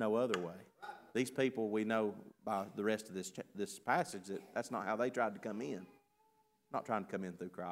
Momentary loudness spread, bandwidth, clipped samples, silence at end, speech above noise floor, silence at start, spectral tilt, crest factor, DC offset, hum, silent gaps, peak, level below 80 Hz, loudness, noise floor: 11 LU; 16 kHz; under 0.1%; 0 s; 36 dB; 0 s; -5 dB/octave; 20 dB; under 0.1%; none; none; -18 dBFS; -86 dBFS; -39 LUFS; -75 dBFS